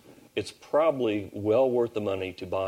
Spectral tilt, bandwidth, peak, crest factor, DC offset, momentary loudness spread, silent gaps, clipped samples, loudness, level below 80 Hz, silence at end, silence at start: -6.5 dB/octave; 15.5 kHz; -12 dBFS; 14 dB; under 0.1%; 11 LU; none; under 0.1%; -27 LUFS; -66 dBFS; 0 s; 0.1 s